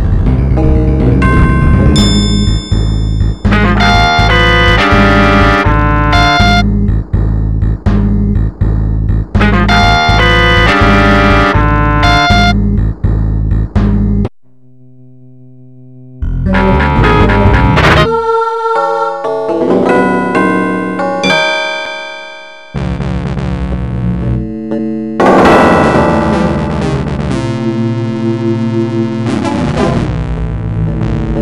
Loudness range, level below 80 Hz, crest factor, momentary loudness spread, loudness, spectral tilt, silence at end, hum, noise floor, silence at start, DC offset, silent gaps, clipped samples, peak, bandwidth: 7 LU; -16 dBFS; 10 dB; 9 LU; -10 LUFS; -6.5 dB/octave; 0 s; none; -46 dBFS; 0 s; 1%; none; under 0.1%; 0 dBFS; 11 kHz